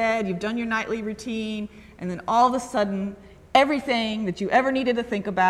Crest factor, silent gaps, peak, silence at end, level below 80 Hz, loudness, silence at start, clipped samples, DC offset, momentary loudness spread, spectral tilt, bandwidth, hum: 20 dB; none; -4 dBFS; 0 s; -54 dBFS; -24 LUFS; 0 s; under 0.1%; under 0.1%; 12 LU; -5 dB/octave; 13 kHz; none